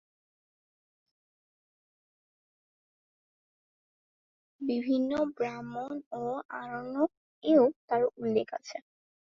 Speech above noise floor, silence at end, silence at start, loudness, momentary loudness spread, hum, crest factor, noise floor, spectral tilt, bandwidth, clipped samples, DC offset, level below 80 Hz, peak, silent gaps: over 60 dB; 0.6 s; 4.6 s; -31 LUFS; 14 LU; none; 22 dB; under -90 dBFS; -6.5 dB/octave; 7.4 kHz; under 0.1%; under 0.1%; -74 dBFS; -12 dBFS; 6.06-6.11 s, 6.45-6.49 s, 7.17-7.42 s, 7.76-7.88 s